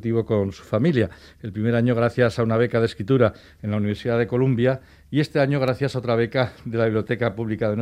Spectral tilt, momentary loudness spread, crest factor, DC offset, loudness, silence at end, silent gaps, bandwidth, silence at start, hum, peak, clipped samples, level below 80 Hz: -8 dB/octave; 6 LU; 18 dB; under 0.1%; -22 LUFS; 0 s; none; 10.5 kHz; 0 s; none; -4 dBFS; under 0.1%; -52 dBFS